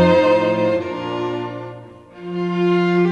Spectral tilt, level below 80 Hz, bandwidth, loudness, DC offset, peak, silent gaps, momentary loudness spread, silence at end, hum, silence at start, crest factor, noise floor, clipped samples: -7.5 dB/octave; -54 dBFS; 8.2 kHz; -19 LUFS; under 0.1%; -2 dBFS; none; 18 LU; 0 s; none; 0 s; 16 dB; -38 dBFS; under 0.1%